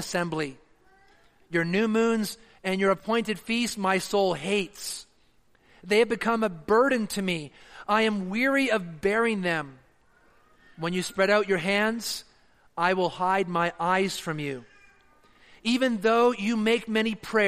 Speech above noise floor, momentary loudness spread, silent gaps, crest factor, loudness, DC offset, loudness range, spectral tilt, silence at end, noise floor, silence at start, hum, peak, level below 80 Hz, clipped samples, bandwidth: 39 dB; 10 LU; none; 18 dB; -26 LUFS; under 0.1%; 3 LU; -4.5 dB/octave; 0 s; -64 dBFS; 0 s; none; -10 dBFS; -62 dBFS; under 0.1%; 15 kHz